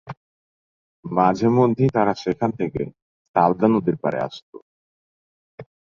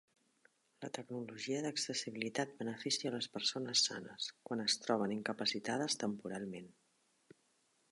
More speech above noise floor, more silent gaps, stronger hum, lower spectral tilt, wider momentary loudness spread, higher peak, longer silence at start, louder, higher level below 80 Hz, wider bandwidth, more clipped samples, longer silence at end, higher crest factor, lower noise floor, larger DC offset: first, over 70 dB vs 37 dB; first, 0.17-1.03 s, 3.02-3.34 s, 4.42-4.53 s, 4.62-5.58 s vs none; neither; first, -8 dB/octave vs -2.5 dB/octave; first, 17 LU vs 12 LU; first, -2 dBFS vs -20 dBFS; second, 0.05 s vs 0.8 s; first, -21 LUFS vs -38 LUFS; first, -56 dBFS vs -84 dBFS; second, 7.2 kHz vs 11.5 kHz; neither; second, 0.35 s vs 1.2 s; about the same, 20 dB vs 22 dB; first, under -90 dBFS vs -77 dBFS; neither